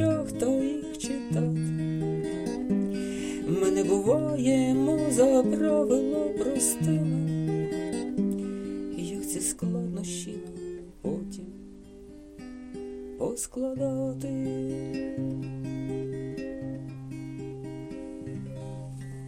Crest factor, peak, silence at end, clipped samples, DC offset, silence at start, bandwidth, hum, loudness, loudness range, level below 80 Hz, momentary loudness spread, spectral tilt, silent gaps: 18 dB; -10 dBFS; 0 s; under 0.1%; under 0.1%; 0 s; 16 kHz; none; -29 LUFS; 12 LU; -54 dBFS; 15 LU; -6 dB/octave; none